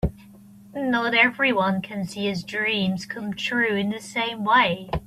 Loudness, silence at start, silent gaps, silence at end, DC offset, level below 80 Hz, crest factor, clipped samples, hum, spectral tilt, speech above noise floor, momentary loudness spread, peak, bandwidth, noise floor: -23 LUFS; 0.05 s; none; 0 s; under 0.1%; -44 dBFS; 20 dB; under 0.1%; none; -5 dB/octave; 24 dB; 11 LU; -4 dBFS; 14 kHz; -47 dBFS